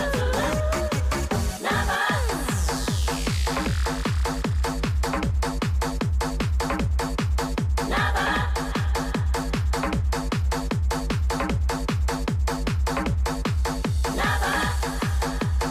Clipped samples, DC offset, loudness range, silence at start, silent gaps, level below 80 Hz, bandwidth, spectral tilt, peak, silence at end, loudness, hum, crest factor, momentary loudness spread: under 0.1%; under 0.1%; 1 LU; 0 s; none; -28 dBFS; 16 kHz; -5 dB/octave; -12 dBFS; 0 s; -25 LUFS; none; 12 dB; 3 LU